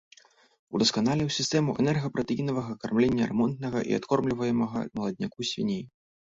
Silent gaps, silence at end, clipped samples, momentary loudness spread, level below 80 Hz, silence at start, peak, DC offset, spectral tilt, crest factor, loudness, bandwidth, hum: none; 0.45 s; under 0.1%; 7 LU; -58 dBFS; 0.7 s; -12 dBFS; under 0.1%; -5.5 dB/octave; 16 dB; -28 LUFS; 7.8 kHz; none